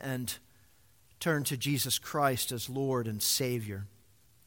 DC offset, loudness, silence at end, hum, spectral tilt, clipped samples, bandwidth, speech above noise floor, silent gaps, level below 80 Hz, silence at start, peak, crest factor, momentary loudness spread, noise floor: under 0.1%; -31 LUFS; 0.6 s; none; -3.5 dB/octave; under 0.1%; 17 kHz; 33 dB; none; -66 dBFS; 0 s; -14 dBFS; 20 dB; 12 LU; -65 dBFS